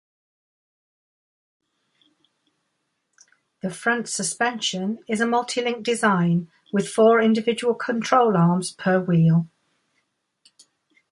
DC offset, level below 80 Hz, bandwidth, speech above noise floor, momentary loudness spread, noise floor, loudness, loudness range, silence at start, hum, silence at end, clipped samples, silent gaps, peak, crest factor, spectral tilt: under 0.1%; -70 dBFS; 11.5 kHz; 54 dB; 9 LU; -75 dBFS; -21 LUFS; 10 LU; 3.65 s; none; 1.65 s; under 0.1%; none; -4 dBFS; 20 dB; -5.5 dB/octave